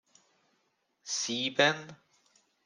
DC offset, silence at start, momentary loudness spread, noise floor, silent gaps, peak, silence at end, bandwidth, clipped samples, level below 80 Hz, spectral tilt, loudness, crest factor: under 0.1%; 1.05 s; 22 LU; -76 dBFS; none; -10 dBFS; 0.7 s; 11 kHz; under 0.1%; -82 dBFS; -2 dB/octave; -29 LUFS; 24 dB